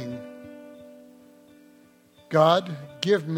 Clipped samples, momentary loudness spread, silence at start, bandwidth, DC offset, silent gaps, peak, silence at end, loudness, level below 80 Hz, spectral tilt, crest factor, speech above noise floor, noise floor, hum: under 0.1%; 26 LU; 0 s; 16 kHz; under 0.1%; none; -6 dBFS; 0 s; -23 LUFS; -70 dBFS; -6 dB/octave; 20 dB; 34 dB; -56 dBFS; none